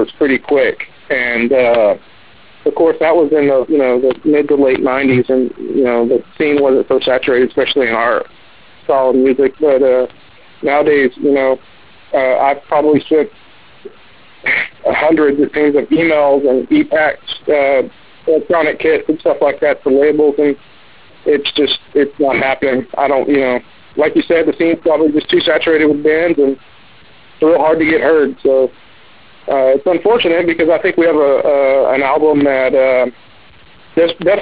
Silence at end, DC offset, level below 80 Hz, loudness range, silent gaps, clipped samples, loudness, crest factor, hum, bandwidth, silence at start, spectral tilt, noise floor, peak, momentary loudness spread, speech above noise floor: 0 s; 0.8%; -50 dBFS; 2 LU; none; under 0.1%; -13 LUFS; 12 dB; none; 4 kHz; 0 s; -9 dB/octave; -43 dBFS; -2 dBFS; 5 LU; 31 dB